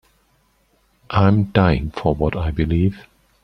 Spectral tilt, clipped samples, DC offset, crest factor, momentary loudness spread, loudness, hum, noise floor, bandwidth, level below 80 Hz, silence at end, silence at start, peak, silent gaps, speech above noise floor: -9 dB/octave; under 0.1%; under 0.1%; 18 dB; 6 LU; -19 LUFS; none; -61 dBFS; 6 kHz; -34 dBFS; 0.45 s; 1.1 s; -2 dBFS; none; 44 dB